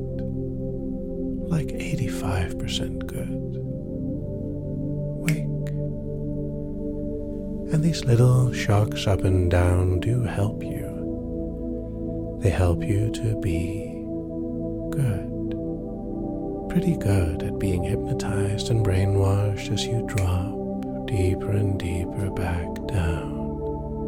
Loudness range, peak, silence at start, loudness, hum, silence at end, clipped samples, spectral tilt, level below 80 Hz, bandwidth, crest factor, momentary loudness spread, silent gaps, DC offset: 7 LU; -6 dBFS; 0 s; -26 LUFS; none; 0 s; under 0.1%; -7 dB/octave; -36 dBFS; 15.5 kHz; 18 dB; 10 LU; none; under 0.1%